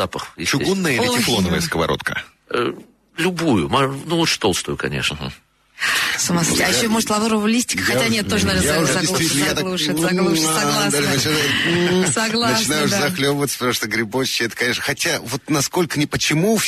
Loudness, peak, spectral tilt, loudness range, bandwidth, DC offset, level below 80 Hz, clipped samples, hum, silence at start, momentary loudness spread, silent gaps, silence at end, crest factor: -18 LUFS; -6 dBFS; -3.5 dB/octave; 3 LU; 13.5 kHz; under 0.1%; -44 dBFS; under 0.1%; none; 0 s; 6 LU; none; 0 s; 14 dB